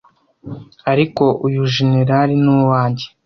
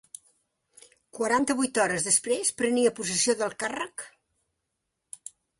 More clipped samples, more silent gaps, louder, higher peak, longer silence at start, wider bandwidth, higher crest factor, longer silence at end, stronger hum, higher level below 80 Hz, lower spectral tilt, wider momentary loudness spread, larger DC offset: neither; neither; first, -15 LUFS vs -26 LUFS; first, -2 dBFS vs -10 dBFS; second, 0.45 s vs 1.15 s; second, 6.4 kHz vs 11.5 kHz; second, 14 dB vs 20 dB; second, 0.2 s vs 1.5 s; neither; first, -52 dBFS vs -68 dBFS; first, -7.5 dB/octave vs -2 dB/octave; second, 15 LU vs 21 LU; neither